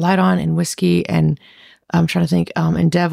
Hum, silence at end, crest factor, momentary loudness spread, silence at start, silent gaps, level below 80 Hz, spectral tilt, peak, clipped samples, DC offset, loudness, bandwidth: none; 0 s; 12 dB; 4 LU; 0 s; none; -46 dBFS; -6.5 dB/octave; -4 dBFS; under 0.1%; under 0.1%; -17 LUFS; 14.5 kHz